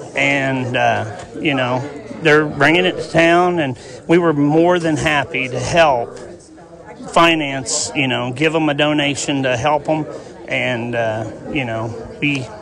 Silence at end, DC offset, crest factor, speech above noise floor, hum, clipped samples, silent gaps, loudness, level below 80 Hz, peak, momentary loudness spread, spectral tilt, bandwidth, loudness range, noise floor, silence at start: 0 s; under 0.1%; 14 dB; 23 dB; none; under 0.1%; none; -16 LUFS; -46 dBFS; -2 dBFS; 11 LU; -4.5 dB/octave; 11.5 kHz; 4 LU; -39 dBFS; 0 s